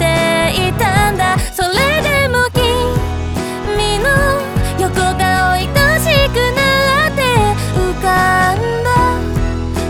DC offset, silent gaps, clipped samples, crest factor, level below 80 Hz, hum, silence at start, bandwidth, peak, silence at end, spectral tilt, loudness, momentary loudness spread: under 0.1%; none; under 0.1%; 14 dB; -24 dBFS; none; 0 s; 19 kHz; 0 dBFS; 0 s; -4.5 dB/octave; -13 LUFS; 6 LU